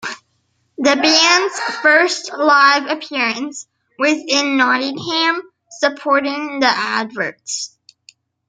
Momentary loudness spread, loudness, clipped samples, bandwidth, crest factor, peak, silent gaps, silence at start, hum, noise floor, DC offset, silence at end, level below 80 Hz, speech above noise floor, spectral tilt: 14 LU; -15 LUFS; under 0.1%; 9.6 kHz; 18 dB; 0 dBFS; none; 0 s; none; -65 dBFS; under 0.1%; 0.8 s; -70 dBFS; 49 dB; -1.5 dB/octave